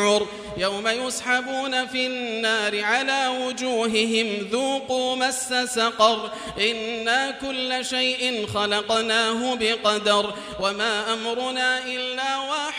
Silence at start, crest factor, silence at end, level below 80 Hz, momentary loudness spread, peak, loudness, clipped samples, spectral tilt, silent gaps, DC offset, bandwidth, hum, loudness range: 0 s; 20 dB; 0 s; -58 dBFS; 5 LU; -4 dBFS; -23 LUFS; under 0.1%; -2 dB/octave; none; under 0.1%; 16 kHz; none; 1 LU